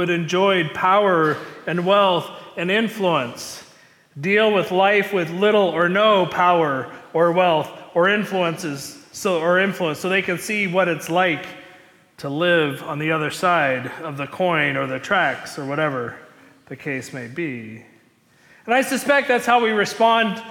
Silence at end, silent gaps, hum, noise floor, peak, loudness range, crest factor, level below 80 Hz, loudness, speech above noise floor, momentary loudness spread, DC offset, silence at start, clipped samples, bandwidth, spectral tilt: 0 s; none; none; -56 dBFS; -6 dBFS; 6 LU; 14 dB; -66 dBFS; -19 LUFS; 36 dB; 12 LU; under 0.1%; 0 s; under 0.1%; 18 kHz; -4.5 dB/octave